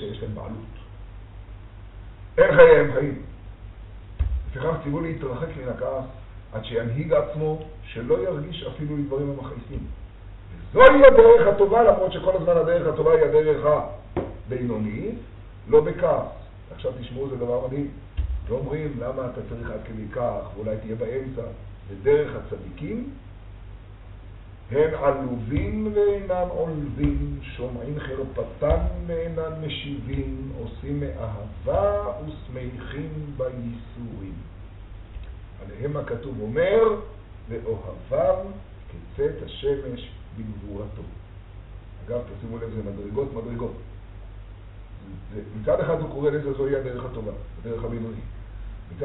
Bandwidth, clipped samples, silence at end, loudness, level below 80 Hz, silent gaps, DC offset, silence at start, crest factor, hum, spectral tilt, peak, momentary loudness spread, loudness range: 4.1 kHz; under 0.1%; 0 s; -23 LUFS; -38 dBFS; none; under 0.1%; 0 s; 24 dB; none; -5.5 dB/octave; 0 dBFS; 24 LU; 17 LU